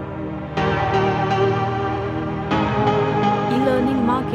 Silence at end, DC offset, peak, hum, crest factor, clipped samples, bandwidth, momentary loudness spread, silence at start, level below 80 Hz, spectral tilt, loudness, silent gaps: 0 s; under 0.1%; -6 dBFS; none; 14 dB; under 0.1%; 10 kHz; 6 LU; 0 s; -40 dBFS; -7.5 dB/octave; -20 LUFS; none